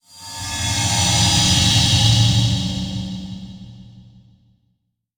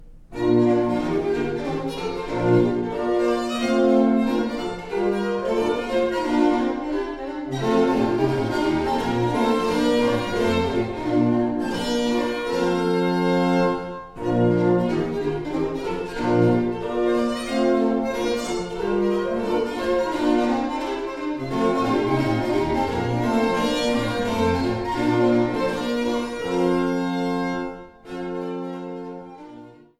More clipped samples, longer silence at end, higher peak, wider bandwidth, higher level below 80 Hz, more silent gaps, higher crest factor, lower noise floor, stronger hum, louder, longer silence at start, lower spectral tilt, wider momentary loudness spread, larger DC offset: neither; first, 1.15 s vs 0.3 s; first, -2 dBFS vs -8 dBFS; first, over 20 kHz vs 13 kHz; first, -36 dBFS vs -44 dBFS; neither; about the same, 16 dB vs 14 dB; first, -70 dBFS vs -44 dBFS; neither; first, -16 LUFS vs -22 LUFS; first, 0.15 s vs 0 s; second, -3 dB/octave vs -6.5 dB/octave; first, 19 LU vs 9 LU; neither